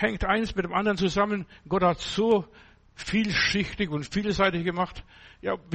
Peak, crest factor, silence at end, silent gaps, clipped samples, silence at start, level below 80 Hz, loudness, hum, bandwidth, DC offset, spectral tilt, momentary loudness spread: -8 dBFS; 18 dB; 0 s; none; under 0.1%; 0 s; -44 dBFS; -26 LUFS; none; 8.4 kHz; under 0.1%; -5 dB/octave; 9 LU